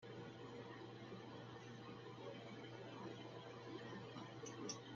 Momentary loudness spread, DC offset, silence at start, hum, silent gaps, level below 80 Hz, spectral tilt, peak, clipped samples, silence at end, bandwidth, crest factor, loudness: 4 LU; under 0.1%; 0 s; none; none; -84 dBFS; -4.5 dB/octave; -34 dBFS; under 0.1%; 0 s; 7.4 kHz; 20 dB; -54 LUFS